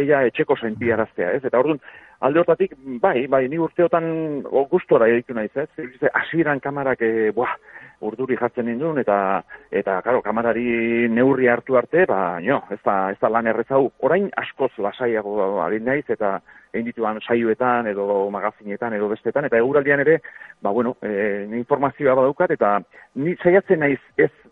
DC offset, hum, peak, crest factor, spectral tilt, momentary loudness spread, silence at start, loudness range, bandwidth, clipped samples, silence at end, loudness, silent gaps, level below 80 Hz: under 0.1%; none; -2 dBFS; 18 dB; -9.5 dB/octave; 9 LU; 0 s; 3 LU; 4 kHz; under 0.1%; 0.25 s; -21 LUFS; none; -60 dBFS